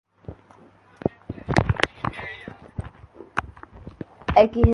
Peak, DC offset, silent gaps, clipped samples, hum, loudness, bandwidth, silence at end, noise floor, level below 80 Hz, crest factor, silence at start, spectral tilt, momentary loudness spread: 0 dBFS; under 0.1%; none; under 0.1%; none; -24 LUFS; 11.5 kHz; 0 s; -52 dBFS; -36 dBFS; 24 dB; 0.3 s; -7 dB/octave; 25 LU